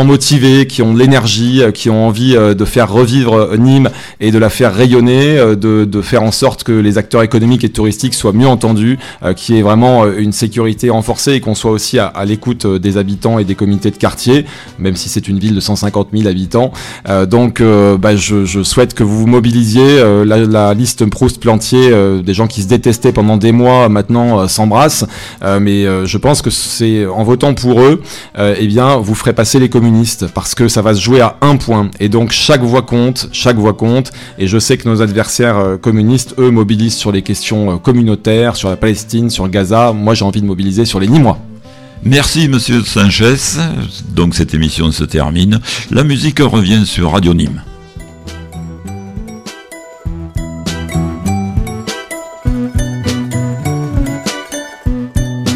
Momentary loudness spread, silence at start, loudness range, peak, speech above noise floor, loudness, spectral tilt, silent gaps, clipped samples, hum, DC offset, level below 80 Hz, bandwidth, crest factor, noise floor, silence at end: 10 LU; 0 s; 8 LU; 0 dBFS; 23 dB; -10 LUFS; -5.5 dB/octave; none; under 0.1%; none; under 0.1%; -30 dBFS; 16 kHz; 10 dB; -32 dBFS; 0 s